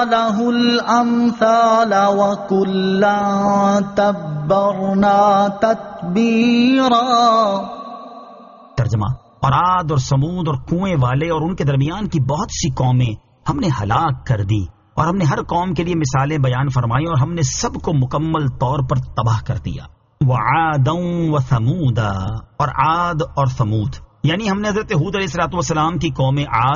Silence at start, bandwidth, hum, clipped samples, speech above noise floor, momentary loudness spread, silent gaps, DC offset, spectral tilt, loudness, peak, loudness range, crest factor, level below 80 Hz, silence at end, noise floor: 0 s; 7.2 kHz; none; under 0.1%; 24 dB; 8 LU; none; under 0.1%; -6 dB/octave; -17 LUFS; -2 dBFS; 4 LU; 14 dB; -38 dBFS; 0 s; -40 dBFS